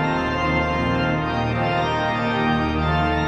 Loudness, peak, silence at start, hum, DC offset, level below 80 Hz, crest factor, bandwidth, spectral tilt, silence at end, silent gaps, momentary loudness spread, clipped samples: -21 LUFS; -8 dBFS; 0 s; none; under 0.1%; -34 dBFS; 12 dB; 8.8 kHz; -7 dB/octave; 0 s; none; 1 LU; under 0.1%